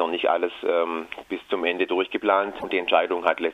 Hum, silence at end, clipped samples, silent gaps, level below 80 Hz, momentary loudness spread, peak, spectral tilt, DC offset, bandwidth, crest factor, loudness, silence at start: none; 0 s; under 0.1%; none; -64 dBFS; 8 LU; -4 dBFS; -5 dB/octave; under 0.1%; 12.5 kHz; 20 dB; -24 LUFS; 0 s